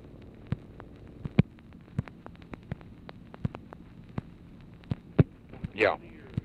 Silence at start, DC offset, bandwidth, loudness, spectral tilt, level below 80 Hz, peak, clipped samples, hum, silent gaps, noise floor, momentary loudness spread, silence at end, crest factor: 0.15 s; under 0.1%; 8 kHz; -33 LUFS; -9 dB/octave; -50 dBFS; -6 dBFS; under 0.1%; none; none; -50 dBFS; 22 LU; 0.05 s; 26 dB